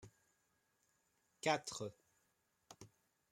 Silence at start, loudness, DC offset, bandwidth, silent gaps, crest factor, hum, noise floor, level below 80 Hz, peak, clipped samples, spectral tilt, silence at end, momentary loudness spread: 0 s; -42 LUFS; under 0.1%; 16 kHz; none; 28 dB; none; -82 dBFS; -84 dBFS; -20 dBFS; under 0.1%; -3 dB/octave; 0.45 s; 22 LU